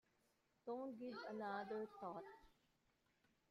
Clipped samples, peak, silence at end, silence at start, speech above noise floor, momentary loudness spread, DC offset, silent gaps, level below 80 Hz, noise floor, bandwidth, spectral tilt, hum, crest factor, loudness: under 0.1%; -36 dBFS; 1 s; 0.65 s; 33 dB; 11 LU; under 0.1%; none; -86 dBFS; -83 dBFS; 13.5 kHz; -6.5 dB/octave; none; 18 dB; -51 LUFS